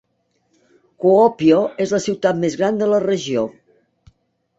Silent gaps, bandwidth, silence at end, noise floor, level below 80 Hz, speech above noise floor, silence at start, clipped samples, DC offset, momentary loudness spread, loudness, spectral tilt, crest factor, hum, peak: none; 8 kHz; 1.1 s; -67 dBFS; -60 dBFS; 51 dB; 1 s; under 0.1%; under 0.1%; 7 LU; -17 LUFS; -6 dB/octave; 16 dB; none; -2 dBFS